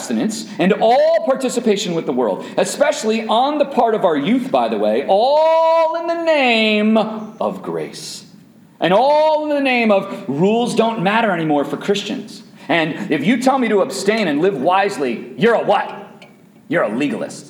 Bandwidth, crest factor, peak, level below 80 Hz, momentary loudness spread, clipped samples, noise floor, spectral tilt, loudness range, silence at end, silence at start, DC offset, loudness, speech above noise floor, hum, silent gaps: 17 kHz; 16 dB; -2 dBFS; -70 dBFS; 10 LU; under 0.1%; -45 dBFS; -5 dB/octave; 3 LU; 0 s; 0 s; under 0.1%; -16 LUFS; 29 dB; none; none